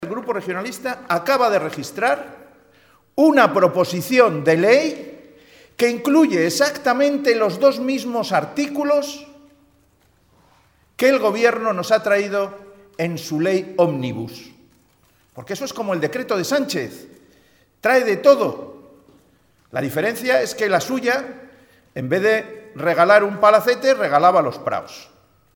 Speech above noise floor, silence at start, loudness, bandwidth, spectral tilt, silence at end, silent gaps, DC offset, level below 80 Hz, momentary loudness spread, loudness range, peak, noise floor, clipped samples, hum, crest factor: 40 dB; 0 s; -18 LUFS; 19 kHz; -5 dB/octave; 0.55 s; none; under 0.1%; -66 dBFS; 14 LU; 7 LU; 0 dBFS; -58 dBFS; under 0.1%; none; 20 dB